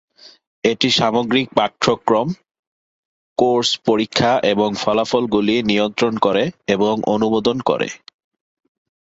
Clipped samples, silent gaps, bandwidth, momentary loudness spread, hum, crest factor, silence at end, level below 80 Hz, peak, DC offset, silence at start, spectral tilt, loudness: under 0.1%; 0.47-0.62 s, 2.59-3.36 s; 8 kHz; 5 LU; none; 18 dB; 1.05 s; -54 dBFS; -2 dBFS; under 0.1%; 0.25 s; -4.5 dB/octave; -18 LUFS